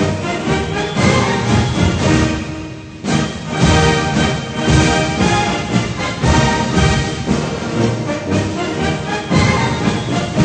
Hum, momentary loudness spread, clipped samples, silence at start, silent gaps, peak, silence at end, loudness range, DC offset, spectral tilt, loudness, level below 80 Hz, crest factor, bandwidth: none; 6 LU; under 0.1%; 0 s; none; 0 dBFS; 0 s; 2 LU; under 0.1%; -5 dB/octave; -16 LUFS; -28 dBFS; 16 dB; 9.2 kHz